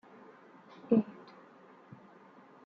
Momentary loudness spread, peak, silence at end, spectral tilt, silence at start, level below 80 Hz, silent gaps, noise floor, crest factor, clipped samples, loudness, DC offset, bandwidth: 27 LU; -14 dBFS; 1.55 s; -8.5 dB/octave; 0.9 s; -82 dBFS; none; -58 dBFS; 24 dB; under 0.1%; -32 LUFS; under 0.1%; 5 kHz